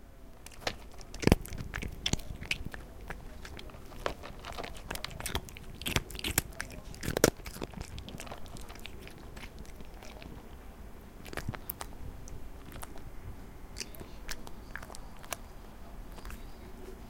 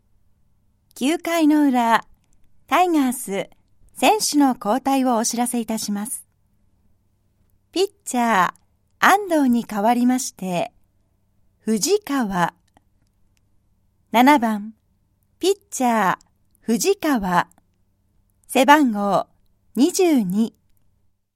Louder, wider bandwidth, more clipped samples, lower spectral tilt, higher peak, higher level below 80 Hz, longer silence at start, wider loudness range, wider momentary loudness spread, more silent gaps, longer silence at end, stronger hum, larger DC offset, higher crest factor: second, -38 LUFS vs -20 LUFS; about the same, 17 kHz vs 16.5 kHz; neither; about the same, -4 dB/octave vs -4 dB/octave; about the same, -2 dBFS vs 0 dBFS; first, -46 dBFS vs -58 dBFS; second, 0 s vs 0.95 s; first, 12 LU vs 5 LU; first, 17 LU vs 11 LU; neither; second, 0 s vs 0.85 s; neither; neither; first, 36 dB vs 22 dB